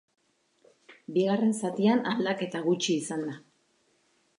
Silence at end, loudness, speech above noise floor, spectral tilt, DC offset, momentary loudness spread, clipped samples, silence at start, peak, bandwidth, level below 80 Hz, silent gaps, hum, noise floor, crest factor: 1 s; -28 LUFS; 42 dB; -5 dB/octave; under 0.1%; 11 LU; under 0.1%; 0.9 s; -12 dBFS; 11.5 kHz; -80 dBFS; none; none; -69 dBFS; 18 dB